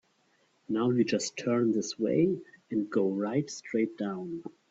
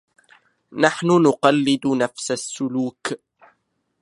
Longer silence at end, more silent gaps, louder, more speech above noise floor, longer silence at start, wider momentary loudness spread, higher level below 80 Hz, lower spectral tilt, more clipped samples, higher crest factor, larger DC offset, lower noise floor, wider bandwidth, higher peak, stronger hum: second, 0.2 s vs 0.85 s; neither; second, -30 LUFS vs -20 LUFS; second, 40 dB vs 50 dB; about the same, 0.7 s vs 0.7 s; second, 9 LU vs 14 LU; second, -74 dBFS vs -68 dBFS; about the same, -5.5 dB/octave vs -5 dB/octave; neither; second, 16 dB vs 22 dB; neither; about the same, -70 dBFS vs -70 dBFS; second, 8 kHz vs 11.5 kHz; second, -14 dBFS vs 0 dBFS; neither